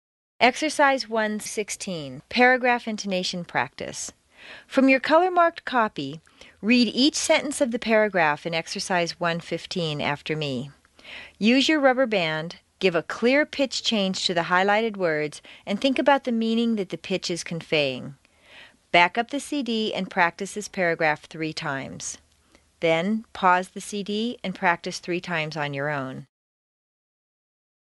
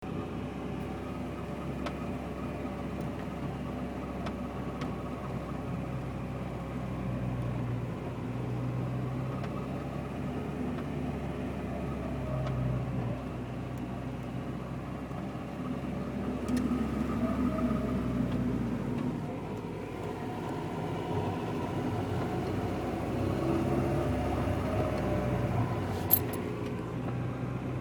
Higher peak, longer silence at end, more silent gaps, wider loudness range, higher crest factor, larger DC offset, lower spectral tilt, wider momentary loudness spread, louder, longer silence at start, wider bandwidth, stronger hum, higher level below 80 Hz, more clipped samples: first, -2 dBFS vs -8 dBFS; first, 1.75 s vs 0 s; neither; about the same, 4 LU vs 6 LU; about the same, 22 dB vs 26 dB; neither; second, -4 dB/octave vs -7.5 dB/octave; first, 13 LU vs 7 LU; first, -23 LUFS vs -34 LUFS; first, 0.4 s vs 0 s; second, 11.5 kHz vs 19 kHz; neither; second, -64 dBFS vs -46 dBFS; neither